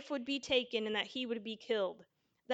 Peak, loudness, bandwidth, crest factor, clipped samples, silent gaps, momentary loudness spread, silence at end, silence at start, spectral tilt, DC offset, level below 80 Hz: -18 dBFS; -36 LUFS; 9 kHz; 20 dB; under 0.1%; none; 7 LU; 0 s; 0 s; -3.5 dB/octave; under 0.1%; -76 dBFS